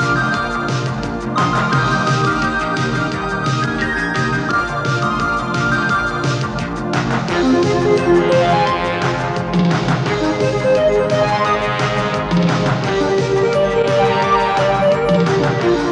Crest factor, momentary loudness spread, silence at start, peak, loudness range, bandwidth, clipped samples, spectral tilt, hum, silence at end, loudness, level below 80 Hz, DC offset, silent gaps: 14 dB; 5 LU; 0 s; -2 dBFS; 3 LU; 10.5 kHz; under 0.1%; -6 dB/octave; none; 0 s; -16 LUFS; -38 dBFS; under 0.1%; none